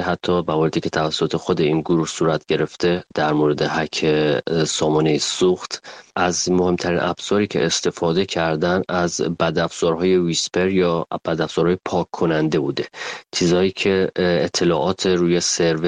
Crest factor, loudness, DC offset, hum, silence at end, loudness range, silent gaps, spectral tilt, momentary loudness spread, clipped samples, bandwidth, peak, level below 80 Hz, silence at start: 16 dB; -20 LUFS; under 0.1%; none; 0 s; 1 LU; none; -4.5 dB/octave; 4 LU; under 0.1%; 10 kHz; -2 dBFS; -50 dBFS; 0 s